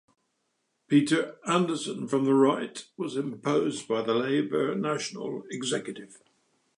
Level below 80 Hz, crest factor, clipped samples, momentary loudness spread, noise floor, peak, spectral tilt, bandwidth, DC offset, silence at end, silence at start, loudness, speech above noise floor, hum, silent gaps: -80 dBFS; 18 dB; under 0.1%; 12 LU; -77 dBFS; -10 dBFS; -5 dB/octave; 11 kHz; under 0.1%; 0.6 s; 0.9 s; -28 LUFS; 49 dB; none; none